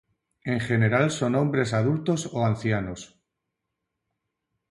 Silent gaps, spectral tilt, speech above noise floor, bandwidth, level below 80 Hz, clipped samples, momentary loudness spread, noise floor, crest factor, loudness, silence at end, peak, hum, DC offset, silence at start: none; -6.5 dB/octave; 58 dB; 11.5 kHz; -56 dBFS; under 0.1%; 9 LU; -82 dBFS; 18 dB; -25 LUFS; 1.65 s; -8 dBFS; none; under 0.1%; 0.45 s